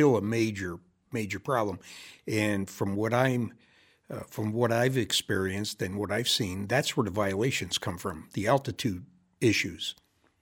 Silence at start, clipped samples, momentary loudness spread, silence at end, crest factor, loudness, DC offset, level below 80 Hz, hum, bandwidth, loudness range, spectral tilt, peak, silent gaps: 0 s; under 0.1%; 12 LU; 0.5 s; 20 dB; -29 LUFS; under 0.1%; -62 dBFS; none; 17.5 kHz; 3 LU; -4.5 dB/octave; -8 dBFS; none